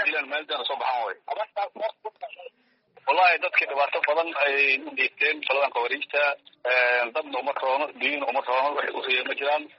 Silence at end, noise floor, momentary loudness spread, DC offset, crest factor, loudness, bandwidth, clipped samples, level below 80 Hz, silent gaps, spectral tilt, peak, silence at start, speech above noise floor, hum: 0.1 s; -60 dBFS; 11 LU; under 0.1%; 18 dB; -24 LUFS; 5.8 kHz; under 0.1%; -84 dBFS; none; 3.5 dB/octave; -6 dBFS; 0 s; 35 dB; none